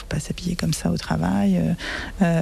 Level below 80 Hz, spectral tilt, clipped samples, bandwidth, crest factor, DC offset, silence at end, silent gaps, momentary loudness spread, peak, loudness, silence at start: -38 dBFS; -6 dB/octave; under 0.1%; 14 kHz; 14 dB; under 0.1%; 0 s; none; 7 LU; -8 dBFS; -23 LUFS; 0 s